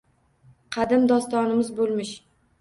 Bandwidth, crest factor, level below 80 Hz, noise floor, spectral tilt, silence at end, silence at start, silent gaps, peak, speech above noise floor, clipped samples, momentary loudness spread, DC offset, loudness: 11.5 kHz; 16 dB; -62 dBFS; -57 dBFS; -5 dB/octave; 0.4 s; 0.7 s; none; -8 dBFS; 35 dB; under 0.1%; 15 LU; under 0.1%; -23 LUFS